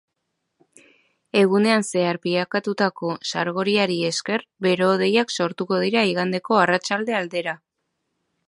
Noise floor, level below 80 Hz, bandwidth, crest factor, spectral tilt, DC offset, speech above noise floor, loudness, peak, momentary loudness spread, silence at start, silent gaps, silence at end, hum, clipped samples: -77 dBFS; -72 dBFS; 11.5 kHz; 20 dB; -4.5 dB/octave; under 0.1%; 56 dB; -21 LUFS; -2 dBFS; 7 LU; 1.35 s; none; 0.95 s; none; under 0.1%